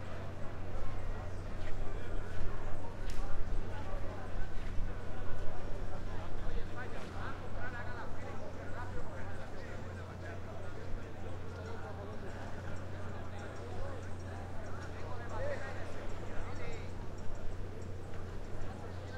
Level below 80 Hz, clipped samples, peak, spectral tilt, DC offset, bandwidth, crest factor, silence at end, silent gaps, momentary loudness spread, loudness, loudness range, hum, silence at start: -42 dBFS; under 0.1%; -18 dBFS; -6.5 dB/octave; under 0.1%; 7.8 kHz; 14 dB; 0 s; none; 3 LU; -45 LUFS; 2 LU; none; 0 s